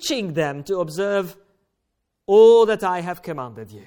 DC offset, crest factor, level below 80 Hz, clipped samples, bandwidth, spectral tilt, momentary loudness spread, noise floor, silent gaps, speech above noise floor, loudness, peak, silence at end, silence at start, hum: under 0.1%; 16 dB; -62 dBFS; under 0.1%; 17.5 kHz; -5 dB/octave; 20 LU; -76 dBFS; none; 57 dB; -18 LUFS; -4 dBFS; 0.05 s; 0 s; none